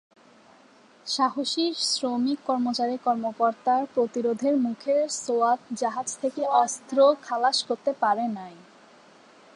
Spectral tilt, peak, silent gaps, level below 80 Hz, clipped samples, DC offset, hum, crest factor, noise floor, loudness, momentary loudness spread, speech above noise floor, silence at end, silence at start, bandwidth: -2.5 dB/octave; -8 dBFS; none; -82 dBFS; under 0.1%; under 0.1%; none; 18 dB; -55 dBFS; -25 LUFS; 6 LU; 30 dB; 1 s; 1.05 s; 11.5 kHz